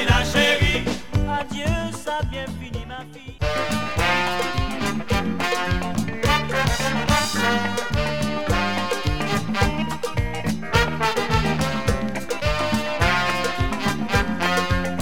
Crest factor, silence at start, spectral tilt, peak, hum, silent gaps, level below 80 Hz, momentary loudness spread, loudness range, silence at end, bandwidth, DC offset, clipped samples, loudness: 18 dB; 0 s; -4.5 dB/octave; -4 dBFS; none; none; -32 dBFS; 7 LU; 3 LU; 0 s; 17 kHz; 2%; under 0.1%; -22 LUFS